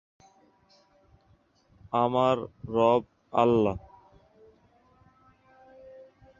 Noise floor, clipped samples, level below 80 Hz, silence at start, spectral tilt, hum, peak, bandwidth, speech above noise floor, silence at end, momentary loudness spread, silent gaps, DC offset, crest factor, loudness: -65 dBFS; under 0.1%; -58 dBFS; 1.95 s; -7.5 dB/octave; none; -8 dBFS; 7.6 kHz; 40 dB; 0.35 s; 8 LU; none; under 0.1%; 22 dB; -26 LUFS